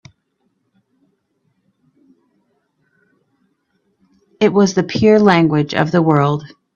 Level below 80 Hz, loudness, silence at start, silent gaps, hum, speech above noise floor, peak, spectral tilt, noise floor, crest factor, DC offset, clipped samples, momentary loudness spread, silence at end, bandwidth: -56 dBFS; -14 LUFS; 4.4 s; none; none; 54 dB; 0 dBFS; -6.5 dB/octave; -67 dBFS; 18 dB; under 0.1%; under 0.1%; 7 LU; 0.3 s; 7.2 kHz